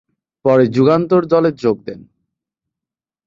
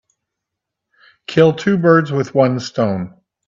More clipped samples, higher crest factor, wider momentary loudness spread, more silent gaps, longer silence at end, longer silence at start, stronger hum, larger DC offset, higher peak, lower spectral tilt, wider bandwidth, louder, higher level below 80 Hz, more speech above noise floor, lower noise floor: neither; about the same, 14 dB vs 16 dB; about the same, 10 LU vs 12 LU; neither; first, 1.25 s vs 0.4 s; second, 0.45 s vs 1.3 s; neither; neither; about the same, -2 dBFS vs 0 dBFS; first, -8.5 dB/octave vs -7 dB/octave; about the same, 7.4 kHz vs 7.6 kHz; about the same, -15 LUFS vs -15 LUFS; about the same, -56 dBFS vs -60 dBFS; first, 74 dB vs 66 dB; first, -87 dBFS vs -80 dBFS